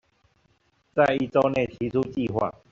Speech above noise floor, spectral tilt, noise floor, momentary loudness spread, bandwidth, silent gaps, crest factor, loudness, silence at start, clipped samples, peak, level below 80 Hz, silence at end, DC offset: 43 dB; -5.5 dB/octave; -67 dBFS; 6 LU; 7.6 kHz; none; 20 dB; -25 LUFS; 0.95 s; under 0.1%; -6 dBFS; -56 dBFS; 0.2 s; under 0.1%